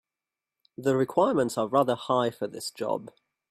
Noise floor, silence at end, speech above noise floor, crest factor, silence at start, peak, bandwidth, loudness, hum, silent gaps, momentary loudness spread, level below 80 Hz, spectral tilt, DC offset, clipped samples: -90 dBFS; 0.4 s; 63 dB; 18 dB; 0.8 s; -10 dBFS; 15.5 kHz; -27 LUFS; none; none; 10 LU; -72 dBFS; -5.5 dB/octave; under 0.1%; under 0.1%